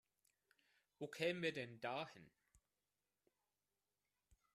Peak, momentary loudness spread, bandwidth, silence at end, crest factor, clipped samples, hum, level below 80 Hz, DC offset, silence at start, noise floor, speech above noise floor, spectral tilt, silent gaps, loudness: -26 dBFS; 13 LU; 13.5 kHz; 2.3 s; 26 dB; under 0.1%; 50 Hz at -85 dBFS; -86 dBFS; under 0.1%; 1 s; under -90 dBFS; over 44 dB; -5 dB/octave; none; -46 LUFS